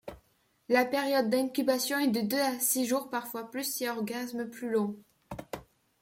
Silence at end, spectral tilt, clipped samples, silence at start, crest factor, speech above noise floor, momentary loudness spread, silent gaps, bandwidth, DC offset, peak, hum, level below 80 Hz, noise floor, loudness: 0.4 s; -3 dB/octave; under 0.1%; 0.05 s; 20 dB; 40 dB; 17 LU; none; 16.5 kHz; under 0.1%; -12 dBFS; none; -66 dBFS; -70 dBFS; -30 LUFS